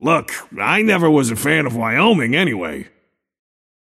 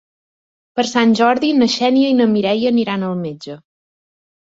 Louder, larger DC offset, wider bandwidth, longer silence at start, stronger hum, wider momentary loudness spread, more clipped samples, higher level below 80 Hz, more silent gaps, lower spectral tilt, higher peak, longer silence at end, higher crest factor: about the same, -16 LUFS vs -15 LUFS; neither; first, 15 kHz vs 7.8 kHz; second, 0 s vs 0.75 s; neither; about the same, 12 LU vs 13 LU; neither; about the same, -56 dBFS vs -60 dBFS; neither; about the same, -5 dB/octave vs -5 dB/octave; about the same, 0 dBFS vs -2 dBFS; first, 1.05 s vs 0.9 s; about the same, 16 dB vs 14 dB